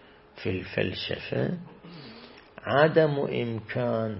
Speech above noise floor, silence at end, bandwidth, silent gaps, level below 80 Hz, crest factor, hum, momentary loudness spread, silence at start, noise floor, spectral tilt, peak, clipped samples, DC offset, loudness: 22 dB; 0 s; 5.8 kHz; none; -60 dBFS; 22 dB; none; 24 LU; 0.35 s; -48 dBFS; -10.5 dB/octave; -6 dBFS; under 0.1%; under 0.1%; -27 LUFS